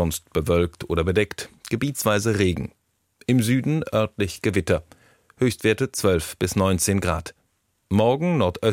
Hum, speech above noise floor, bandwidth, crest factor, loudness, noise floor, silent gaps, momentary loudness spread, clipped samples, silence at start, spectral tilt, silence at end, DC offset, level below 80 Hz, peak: none; 47 dB; 16.5 kHz; 16 dB; -23 LUFS; -69 dBFS; none; 7 LU; under 0.1%; 0 s; -5.5 dB/octave; 0 s; under 0.1%; -42 dBFS; -6 dBFS